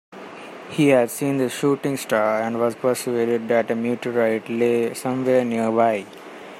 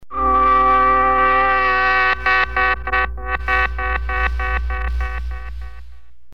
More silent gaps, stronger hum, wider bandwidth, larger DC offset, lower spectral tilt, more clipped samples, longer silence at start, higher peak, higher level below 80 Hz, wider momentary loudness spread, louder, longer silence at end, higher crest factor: neither; neither; first, 16 kHz vs 6.4 kHz; second, under 0.1% vs 2%; about the same, -5.5 dB/octave vs -6 dB/octave; neither; about the same, 0.1 s vs 0 s; about the same, -4 dBFS vs -6 dBFS; second, -68 dBFS vs -26 dBFS; second, 11 LU vs 14 LU; second, -21 LUFS vs -17 LUFS; second, 0 s vs 0.35 s; about the same, 16 dB vs 12 dB